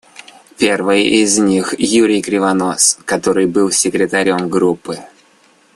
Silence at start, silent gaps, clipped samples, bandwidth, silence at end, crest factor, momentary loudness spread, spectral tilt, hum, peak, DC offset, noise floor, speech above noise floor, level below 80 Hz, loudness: 0.6 s; none; under 0.1%; 12.5 kHz; 0.7 s; 14 dB; 5 LU; -3 dB/octave; none; 0 dBFS; under 0.1%; -51 dBFS; 37 dB; -54 dBFS; -13 LUFS